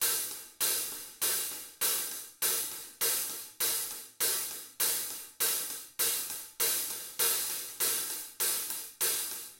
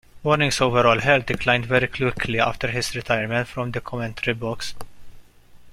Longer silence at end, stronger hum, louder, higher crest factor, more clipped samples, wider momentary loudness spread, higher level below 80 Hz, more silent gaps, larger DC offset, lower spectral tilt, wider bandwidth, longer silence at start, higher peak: about the same, 0 s vs 0 s; neither; second, -31 LUFS vs -22 LUFS; about the same, 20 dB vs 20 dB; neither; second, 8 LU vs 11 LU; second, -76 dBFS vs -44 dBFS; neither; neither; second, 1.5 dB/octave vs -4.5 dB/octave; about the same, 17 kHz vs 15.5 kHz; second, 0 s vs 0.15 s; second, -14 dBFS vs -2 dBFS